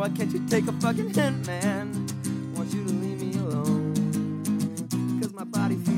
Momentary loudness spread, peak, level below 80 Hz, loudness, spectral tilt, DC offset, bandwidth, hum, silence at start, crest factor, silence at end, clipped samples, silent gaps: 5 LU; -10 dBFS; -66 dBFS; -27 LUFS; -6 dB/octave; under 0.1%; 16.5 kHz; none; 0 s; 16 dB; 0 s; under 0.1%; none